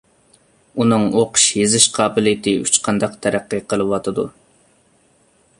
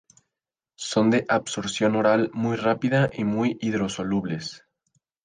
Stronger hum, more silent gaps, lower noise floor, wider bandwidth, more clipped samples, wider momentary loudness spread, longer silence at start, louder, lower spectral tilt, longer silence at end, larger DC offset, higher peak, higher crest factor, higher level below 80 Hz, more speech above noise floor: neither; neither; second, -57 dBFS vs -88 dBFS; first, 16 kHz vs 9.8 kHz; neither; about the same, 10 LU vs 8 LU; about the same, 0.75 s vs 0.8 s; first, -16 LUFS vs -24 LUFS; second, -3 dB/octave vs -5.5 dB/octave; first, 1.3 s vs 0.65 s; neither; first, 0 dBFS vs -8 dBFS; about the same, 18 dB vs 18 dB; first, -54 dBFS vs -60 dBFS; second, 40 dB vs 65 dB